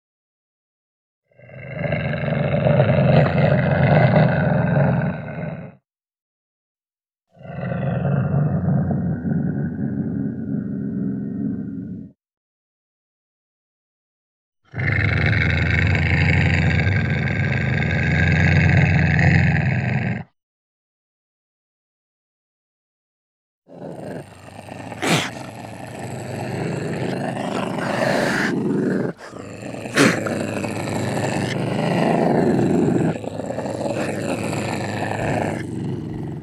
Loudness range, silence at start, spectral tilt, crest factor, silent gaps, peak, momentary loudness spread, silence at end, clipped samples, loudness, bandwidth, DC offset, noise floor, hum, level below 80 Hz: 12 LU; 1.5 s; -6.5 dB/octave; 20 dB; 6.22-6.75 s, 12.37-14.52 s, 20.43-23.62 s; -2 dBFS; 16 LU; 0 s; under 0.1%; -20 LUFS; 13 kHz; under 0.1%; under -90 dBFS; none; -40 dBFS